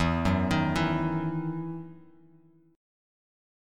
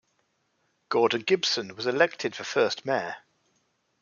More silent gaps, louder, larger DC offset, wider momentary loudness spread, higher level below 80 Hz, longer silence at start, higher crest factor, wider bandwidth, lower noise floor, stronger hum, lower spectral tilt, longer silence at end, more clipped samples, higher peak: neither; about the same, -28 LUFS vs -26 LUFS; neither; first, 13 LU vs 7 LU; first, -46 dBFS vs -78 dBFS; second, 0 s vs 0.9 s; second, 16 dB vs 22 dB; first, 12.5 kHz vs 7.4 kHz; second, -59 dBFS vs -73 dBFS; neither; first, -7 dB/octave vs -3 dB/octave; first, 1 s vs 0.85 s; neither; second, -14 dBFS vs -6 dBFS